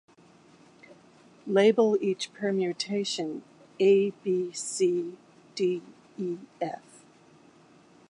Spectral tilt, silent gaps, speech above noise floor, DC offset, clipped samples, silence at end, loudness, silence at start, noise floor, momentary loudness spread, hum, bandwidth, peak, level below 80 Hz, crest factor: -4.5 dB/octave; none; 30 dB; under 0.1%; under 0.1%; 1.3 s; -27 LUFS; 0.9 s; -57 dBFS; 16 LU; none; 11 kHz; -10 dBFS; -82 dBFS; 18 dB